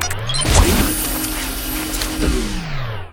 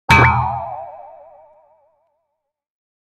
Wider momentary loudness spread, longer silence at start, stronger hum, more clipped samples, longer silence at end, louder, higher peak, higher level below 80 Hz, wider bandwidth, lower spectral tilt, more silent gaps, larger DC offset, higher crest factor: second, 11 LU vs 25 LU; about the same, 0 s vs 0.1 s; neither; neither; second, 0 s vs 1.95 s; second, -19 LUFS vs -15 LUFS; about the same, 0 dBFS vs 0 dBFS; first, -22 dBFS vs -36 dBFS; first, 19 kHz vs 15.5 kHz; second, -3.5 dB/octave vs -5.5 dB/octave; neither; neither; about the same, 18 dB vs 20 dB